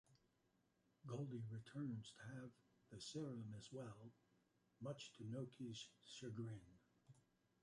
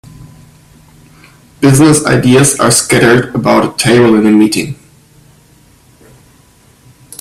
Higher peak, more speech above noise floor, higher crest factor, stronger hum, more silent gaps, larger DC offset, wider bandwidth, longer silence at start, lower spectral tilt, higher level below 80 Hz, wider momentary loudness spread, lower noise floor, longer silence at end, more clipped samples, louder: second, -38 dBFS vs 0 dBFS; second, 30 dB vs 37 dB; first, 18 dB vs 12 dB; neither; neither; neither; second, 11.5 kHz vs 15.5 kHz; about the same, 0.1 s vs 0.2 s; first, -6 dB/octave vs -4.5 dB/octave; second, -84 dBFS vs -42 dBFS; first, 9 LU vs 5 LU; first, -83 dBFS vs -45 dBFS; second, 0.45 s vs 2.5 s; neither; second, -54 LUFS vs -8 LUFS